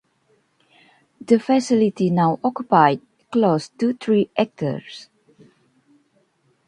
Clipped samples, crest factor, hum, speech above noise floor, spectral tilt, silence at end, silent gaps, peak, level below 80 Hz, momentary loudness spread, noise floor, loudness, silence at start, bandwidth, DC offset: under 0.1%; 22 dB; none; 45 dB; -7 dB/octave; 1.65 s; none; 0 dBFS; -66 dBFS; 11 LU; -64 dBFS; -20 LUFS; 1.3 s; 11 kHz; under 0.1%